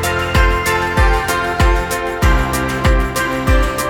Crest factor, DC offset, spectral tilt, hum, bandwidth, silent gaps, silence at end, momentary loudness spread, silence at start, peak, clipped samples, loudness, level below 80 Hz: 14 dB; under 0.1%; -5 dB/octave; none; 18 kHz; none; 0 s; 3 LU; 0 s; 0 dBFS; under 0.1%; -15 LUFS; -18 dBFS